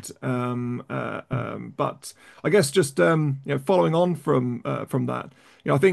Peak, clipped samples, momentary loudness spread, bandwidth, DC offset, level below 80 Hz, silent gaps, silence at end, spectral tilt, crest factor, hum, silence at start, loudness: -6 dBFS; under 0.1%; 11 LU; 12.5 kHz; under 0.1%; -62 dBFS; none; 0 s; -6 dB/octave; 18 dB; none; 0 s; -24 LUFS